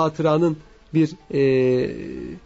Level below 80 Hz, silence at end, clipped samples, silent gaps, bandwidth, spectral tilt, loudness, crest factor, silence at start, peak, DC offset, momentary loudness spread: -50 dBFS; 0.05 s; under 0.1%; none; 8 kHz; -8 dB/octave; -21 LUFS; 14 dB; 0 s; -8 dBFS; under 0.1%; 14 LU